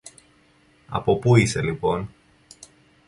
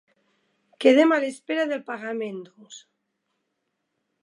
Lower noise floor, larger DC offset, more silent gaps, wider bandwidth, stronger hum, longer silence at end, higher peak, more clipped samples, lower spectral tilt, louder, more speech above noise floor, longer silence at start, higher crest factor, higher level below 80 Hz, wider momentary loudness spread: second, -58 dBFS vs -78 dBFS; neither; neither; about the same, 11.5 kHz vs 11.5 kHz; neither; second, 1 s vs 1.45 s; about the same, -2 dBFS vs -2 dBFS; neither; first, -6 dB/octave vs -4 dB/octave; about the same, -22 LUFS vs -23 LUFS; second, 38 dB vs 55 dB; about the same, 0.9 s vs 0.8 s; about the same, 22 dB vs 22 dB; first, -48 dBFS vs -84 dBFS; second, 13 LU vs 17 LU